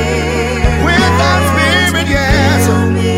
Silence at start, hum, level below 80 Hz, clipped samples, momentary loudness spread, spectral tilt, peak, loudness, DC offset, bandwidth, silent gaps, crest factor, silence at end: 0 s; none; -20 dBFS; under 0.1%; 4 LU; -5 dB/octave; 0 dBFS; -11 LUFS; under 0.1%; 16 kHz; none; 10 dB; 0 s